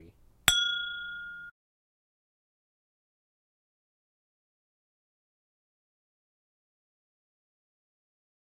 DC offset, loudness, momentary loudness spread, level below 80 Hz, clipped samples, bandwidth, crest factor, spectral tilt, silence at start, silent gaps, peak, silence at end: under 0.1%; -27 LUFS; 19 LU; -62 dBFS; under 0.1%; 16 kHz; 38 dB; 0.5 dB/octave; 0 s; none; -2 dBFS; 7 s